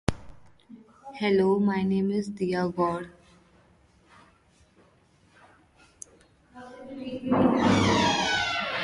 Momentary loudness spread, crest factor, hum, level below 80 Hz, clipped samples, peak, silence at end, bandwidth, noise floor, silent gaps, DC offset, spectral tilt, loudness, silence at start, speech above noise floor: 25 LU; 22 dB; none; -52 dBFS; under 0.1%; -6 dBFS; 0 s; 11.5 kHz; -61 dBFS; none; under 0.1%; -5 dB/octave; -25 LUFS; 0.1 s; 36 dB